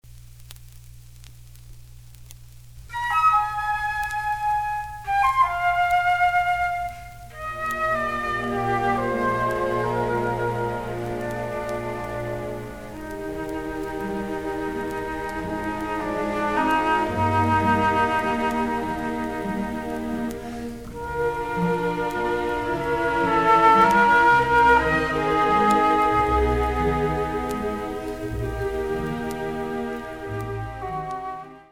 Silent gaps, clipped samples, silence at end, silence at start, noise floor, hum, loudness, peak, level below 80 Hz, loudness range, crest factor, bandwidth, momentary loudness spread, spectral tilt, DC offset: none; under 0.1%; 0.05 s; 0.05 s; -45 dBFS; none; -23 LUFS; -4 dBFS; -40 dBFS; 11 LU; 18 dB; 18 kHz; 13 LU; -6 dB/octave; 0.4%